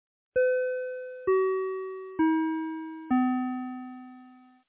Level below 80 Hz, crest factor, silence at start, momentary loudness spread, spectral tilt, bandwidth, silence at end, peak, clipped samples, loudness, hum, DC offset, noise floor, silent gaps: -68 dBFS; 14 dB; 0.35 s; 13 LU; -9.5 dB/octave; 3.8 kHz; 0.3 s; -16 dBFS; under 0.1%; -29 LUFS; none; under 0.1%; -53 dBFS; none